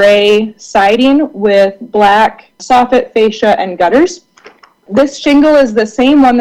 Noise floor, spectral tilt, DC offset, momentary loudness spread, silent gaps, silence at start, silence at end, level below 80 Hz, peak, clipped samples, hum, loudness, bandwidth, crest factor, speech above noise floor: -40 dBFS; -4.5 dB/octave; under 0.1%; 6 LU; none; 0 s; 0 s; -42 dBFS; 0 dBFS; under 0.1%; none; -9 LUFS; 11.5 kHz; 8 dB; 32 dB